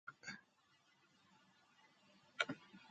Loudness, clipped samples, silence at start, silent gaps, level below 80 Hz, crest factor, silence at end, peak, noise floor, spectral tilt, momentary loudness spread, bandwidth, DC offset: -46 LUFS; under 0.1%; 0.05 s; none; under -90 dBFS; 34 dB; 0 s; -18 dBFS; -76 dBFS; -3 dB/octave; 15 LU; 8.4 kHz; under 0.1%